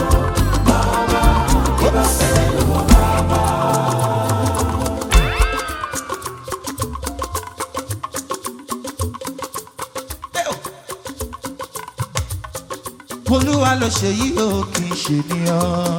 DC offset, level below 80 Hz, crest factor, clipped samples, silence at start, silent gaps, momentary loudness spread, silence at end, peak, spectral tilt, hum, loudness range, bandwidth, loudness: under 0.1%; -24 dBFS; 18 dB; under 0.1%; 0 s; none; 14 LU; 0 s; 0 dBFS; -5 dB/octave; none; 11 LU; 17 kHz; -19 LUFS